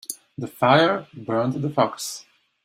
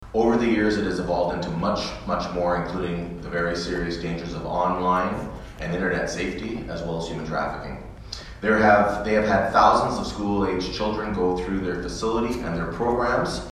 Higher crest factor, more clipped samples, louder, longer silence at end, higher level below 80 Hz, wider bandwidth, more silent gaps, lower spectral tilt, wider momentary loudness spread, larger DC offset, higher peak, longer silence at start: about the same, 22 dB vs 20 dB; neither; about the same, -22 LUFS vs -24 LUFS; first, 0.45 s vs 0 s; second, -64 dBFS vs -40 dBFS; first, 16 kHz vs 13 kHz; neither; about the same, -5 dB/octave vs -5.5 dB/octave; first, 17 LU vs 12 LU; neither; about the same, -2 dBFS vs -4 dBFS; about the same, 0.1 s vs 0 s